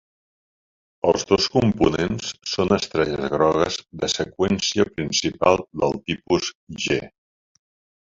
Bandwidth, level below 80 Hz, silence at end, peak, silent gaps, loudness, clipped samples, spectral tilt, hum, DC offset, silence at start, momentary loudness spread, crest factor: 7.8 kHz; -46 dBFS; 1 s; -2 dBFS; 6.55-6.67 s; -22 LUFS; under 0.1%; -4.5 dB/octave; none; under 0.1%; 1.05 s; 7 LU; 20 dB